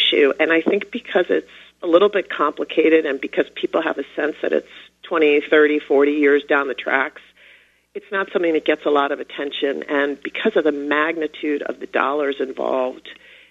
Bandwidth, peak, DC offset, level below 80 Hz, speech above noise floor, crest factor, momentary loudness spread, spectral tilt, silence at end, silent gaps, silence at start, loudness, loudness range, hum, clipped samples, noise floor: 7.4 kHz; 0 dBFS; under 0.1%; -66 dBFS; 33 dB; 20 dB; 9 LU; -5 dB/octave; 0.35 s; none; 0 s; -19 LUFS; 4 LU; none; under 0.1%; -52 dBFS